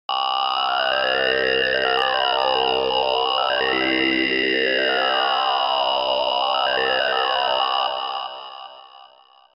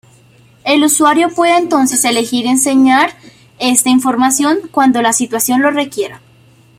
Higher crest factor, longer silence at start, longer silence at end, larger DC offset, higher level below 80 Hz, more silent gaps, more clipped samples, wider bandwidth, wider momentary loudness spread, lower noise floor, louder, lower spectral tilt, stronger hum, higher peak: about the same, 14 dB vs 12 dB; second, 0.1 s vs 0.65 s; about the same, 0.5 s vs 0.6 s; neither; about the same, -56 dBFS vs -58 dBFS; neither; neither; second, 6 kHz vs 16.5 kHz; second, 4 LU vs 8 LU; first, -51 dBFS vs -46 dBFS; second, -20 LUFS vs -12 LUFS; first, -4.5 dB/octave vs -2 dB/octave; neither; second, -6 dBFS vs 0 dBFS